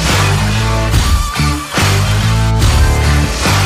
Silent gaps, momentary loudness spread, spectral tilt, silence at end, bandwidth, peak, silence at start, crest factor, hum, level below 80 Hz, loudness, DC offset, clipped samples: none; 3 LU; -4.5 dB/octave; 0 s; 15.5 kHz; 0 dBFS; 0 s; 12 dB; none; -16 dBFS; -13 LUFS; under 0.1%; under 0.1%